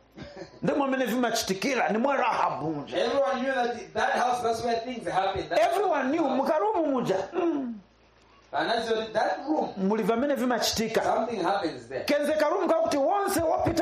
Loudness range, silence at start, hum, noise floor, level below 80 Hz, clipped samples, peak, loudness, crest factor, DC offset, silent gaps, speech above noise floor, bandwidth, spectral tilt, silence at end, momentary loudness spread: 2 LU; 0.15 s; none; -59 dBFS; -58 dBFS; under 0.1%; -12 dBFS; -27 LUFS; 14 dB; under 0.1%; none; 33 dB; 13.5 kHz; -4.5 dB/octave; 0 s; 6 LU